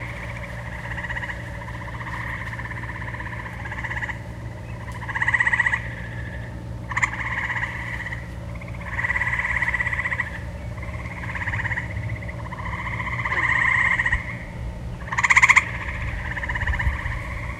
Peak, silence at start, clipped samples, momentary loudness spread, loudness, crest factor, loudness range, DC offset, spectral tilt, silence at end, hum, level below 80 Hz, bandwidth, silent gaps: 0 dBFS; 0 s; under 0.1%; 15 LU; -24 LUFS; 26 dB; 11 LU; under 0.1%; -4 dB/octave; 0 s; 60 Hz at -45 dBFS; -36 dBFS; 13.5 kHz; none